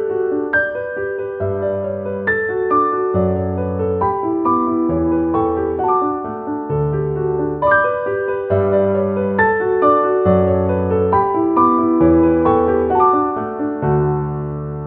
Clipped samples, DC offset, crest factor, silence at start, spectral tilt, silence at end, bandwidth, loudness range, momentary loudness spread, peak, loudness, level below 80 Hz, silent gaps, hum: under 0.1%; under 0.1%; 16 dB; 0 s; -12 dB/octave; 0 s; 3.8 kHz; 4 LU; 8 LU; -2 dBFS; -17 LUFS; -40 dBFS; none; none